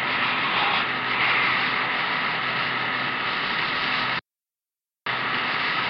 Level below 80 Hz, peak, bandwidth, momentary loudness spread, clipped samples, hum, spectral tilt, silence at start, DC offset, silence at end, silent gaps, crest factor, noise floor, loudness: -60 dBFS; -10 dBFS; 7 kHz; 5 LU; under 0.1%; none; -5 dB/octave; 0 s; under 0.1%; 0 s; none; 16 dB; under -90 dBFS; -23 LUFS